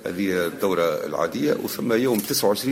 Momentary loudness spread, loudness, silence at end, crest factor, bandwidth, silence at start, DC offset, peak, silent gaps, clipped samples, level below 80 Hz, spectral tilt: 4 LU; -23 LUFS; 0 s; 14 dB; 16.5 kHz; 0 s; under 0.1%; -8 dBFS; none; under 0.1%; -62 dBFS; -4 dB/octave